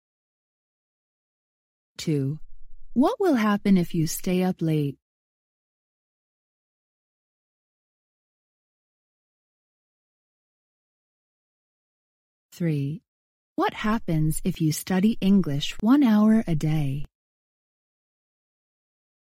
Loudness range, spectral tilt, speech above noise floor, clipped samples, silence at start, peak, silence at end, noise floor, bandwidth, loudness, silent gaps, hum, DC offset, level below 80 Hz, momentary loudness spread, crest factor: 12 LU; -6.5 dB/octave; over 68 dB; under 0.1%; 2 s; -10 dBFS; 2.2 s; under -90 dBFS; 16 kHz; -24 LUFS; 5.02-12.49 s, 13.08-13.56 s; none; under 0.1%; -46 dBFS; 11 LU; 18 dB